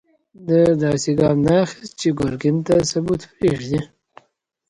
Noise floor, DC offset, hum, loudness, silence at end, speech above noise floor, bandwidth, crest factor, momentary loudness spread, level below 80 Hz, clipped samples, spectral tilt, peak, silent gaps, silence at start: -65 dBFS; under 0.1%; none; -19 LUFS; 0.85 s; 47 dB; 11.5 kHz; 16 dB; 9 LU; -46 dBFS; under 0.1%; -6 dB/octave; -4 dBFS; none; 0.4 s